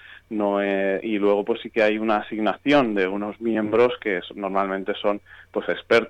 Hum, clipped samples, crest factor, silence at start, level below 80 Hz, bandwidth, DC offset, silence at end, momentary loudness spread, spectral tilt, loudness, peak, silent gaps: none; under 0.1%; 14 dB; 0.05 s; -60 dBFS; 9.2 kHz; under 0.1%; 0 s; 8 LU; -6.5 dB/octave; -23 LUFS; -8 dBFS; none